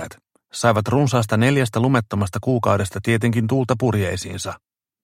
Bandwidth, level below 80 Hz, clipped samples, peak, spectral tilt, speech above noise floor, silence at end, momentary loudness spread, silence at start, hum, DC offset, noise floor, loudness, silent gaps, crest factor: 15.5 kHz; -52 dBFS; under 0.1%; -2 dBFS; -6 dB/octave; 23 dB; 0.45 s; 11 LU; 0 s; none; under 0.1%; -42 dBFS; -20 LUFS; none; 18 dB